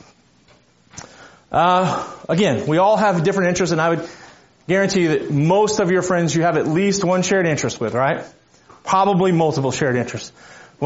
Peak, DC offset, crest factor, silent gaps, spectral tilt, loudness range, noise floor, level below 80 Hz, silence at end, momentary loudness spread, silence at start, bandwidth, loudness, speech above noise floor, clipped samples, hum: -4 dBFS; under 0.1%; 14 dB; none; -5 dB/octave; 2 LU; -54 dBFS; -54 dBFS; 0 s; 11 LU; 0.95 s; 8 kHz; -18 LUFS; 36 dB; under 0.1%; none